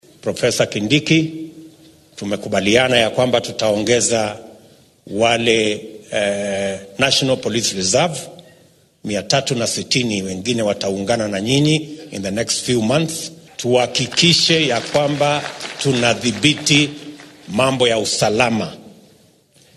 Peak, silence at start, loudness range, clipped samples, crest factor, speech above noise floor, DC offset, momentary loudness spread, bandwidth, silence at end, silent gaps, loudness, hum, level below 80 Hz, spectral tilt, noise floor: 0 dBFS; 0.25 s; 3 LU; under 0.1%; 18 dB; 35 dB; under 0.1%; 12 LU; 13 kHz; 0.85 s; none; -17 LUFS; none; -52 dBFS; -3.5 dB/octave; -52 dBFS